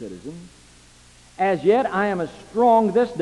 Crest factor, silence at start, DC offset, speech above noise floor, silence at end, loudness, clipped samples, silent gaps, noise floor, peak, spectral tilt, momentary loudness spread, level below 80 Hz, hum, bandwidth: 16 dB; 0 s; under 0.1%; 30 dB; 0 s; -20 LUFS; under 0.1%; none; -50 dBFS; -6 dBFS; -6.5 dB/octave; 20 LU; -56 dBFS; 60 Hz at -50 dBFS; 11.5 kHz